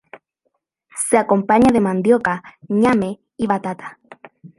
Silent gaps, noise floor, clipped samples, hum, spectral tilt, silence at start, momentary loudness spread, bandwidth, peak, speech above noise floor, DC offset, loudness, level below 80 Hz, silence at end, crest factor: none; -71 dBFS; under 0.1%; none; -5.5 dB/octave; 0.95 s; 15 LU; 11.5 kHz; -2 dBFS; 55 dB; under 0.1%; -17 LUFS; -52 dBFS; 0.1 s; 16 dB